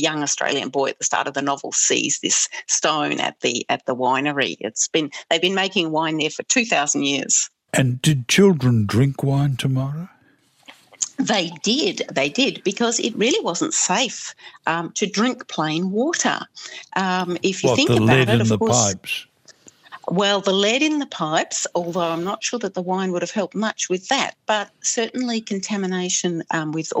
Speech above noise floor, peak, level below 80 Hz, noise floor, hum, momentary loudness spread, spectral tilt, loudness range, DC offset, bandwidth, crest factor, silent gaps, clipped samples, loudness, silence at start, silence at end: 37 dB; -2 dBFS; -58 dBFS; -58 dBFS; none; 7 LU; -3.5 dB/octave; 4 LU; under 0.1%; 15 kHz; 18 dB; none; under 0.1%; -20 LUFS; 0 s; 0 s